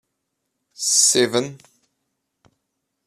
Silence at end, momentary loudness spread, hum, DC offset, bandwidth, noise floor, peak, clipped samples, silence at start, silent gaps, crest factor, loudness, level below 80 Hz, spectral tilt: 1.5 s; 12 LU; none; under 0.1%; 14.5 kHz; -77 dBFS; -2 dBFS; under 0.1%; 0.8 s; none; 22 dB; -17 LUFS; -70 dBFS; -1.5 dB/octave